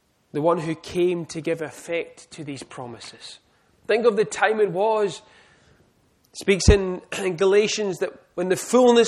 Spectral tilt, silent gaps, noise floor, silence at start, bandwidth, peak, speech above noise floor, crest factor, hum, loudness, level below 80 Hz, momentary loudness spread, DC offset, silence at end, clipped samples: -5 dB/octave; none; -62 dBFS; 0.35 s; 13.5 kHz; 0 dBFS; 40 dB; 22 dB; none; -22 LUFS; -36 dBFS; 19 LU; under 0.1%; 0 s; under 0.1%